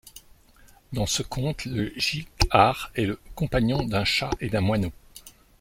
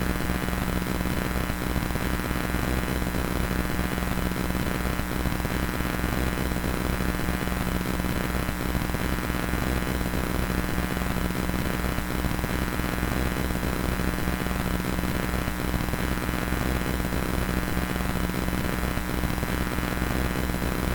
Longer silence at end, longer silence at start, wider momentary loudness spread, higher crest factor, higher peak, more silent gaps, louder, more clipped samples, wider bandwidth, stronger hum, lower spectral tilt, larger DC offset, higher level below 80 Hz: first, 0.3 s vs 0 s; about the same, 0.05 s vs 0 s; first, 10 LU vs 1 LU; first, 24 dB vs 16 dB; first, -2 dBFS vs -10 dBFS; neither; first, -25 LUFS vs -28 LUFS; neither; second, 16.5 kHz vs 19 kHz; neither; about the same, -4.5 dB/octave vs -5.5 dB/octave; neither; second, -40 dBFS vs -32 dBFS